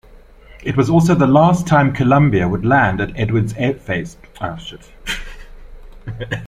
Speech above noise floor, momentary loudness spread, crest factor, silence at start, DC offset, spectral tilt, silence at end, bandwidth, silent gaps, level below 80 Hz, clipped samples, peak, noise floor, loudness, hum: 27 dB; 18 LU; 16 dB; 0.15 s; under 0.1%; -7 dB/octave; 0 s; 14.5 kHz; none; -36 dBFS; under 0.1%; 0 dBFS; -42 dBFS; -16 LUFS; none